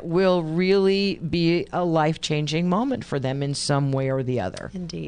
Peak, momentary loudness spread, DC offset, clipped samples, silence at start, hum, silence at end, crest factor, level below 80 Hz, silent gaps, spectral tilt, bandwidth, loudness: -8 dBFS; 7 LU; under 0.1%; under 0.1%; 0 s; none; 0 s; 16 dB; -50 dBFS; none; -6 dB/octave; 10.5 kHz; -23 LUFS